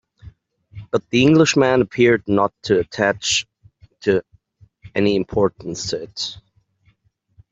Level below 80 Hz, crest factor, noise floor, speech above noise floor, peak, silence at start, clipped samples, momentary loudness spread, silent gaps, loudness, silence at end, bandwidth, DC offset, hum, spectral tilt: -52 dBFS; 18 dB; -62 dBFS; 44 dB; -2 dBFS; 0.25 s; under 0.1%; 13 LU; none; -19 LUFS; 1.15 s; 8.2 kHz; under 0.1%; none; -4.5 dB/octave